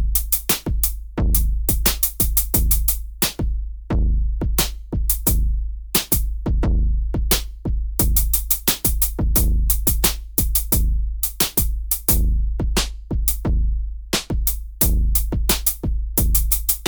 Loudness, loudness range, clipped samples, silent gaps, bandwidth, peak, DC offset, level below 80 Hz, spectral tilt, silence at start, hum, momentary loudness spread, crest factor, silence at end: -20 LUFS; 3 LU; under 0.1%; none; over 20 kHz; -2 dBFS; under 0.1%; -22 dBFS; -3.5 dB/octave; 0 s; none; 7 LU; 18 dB; 0 s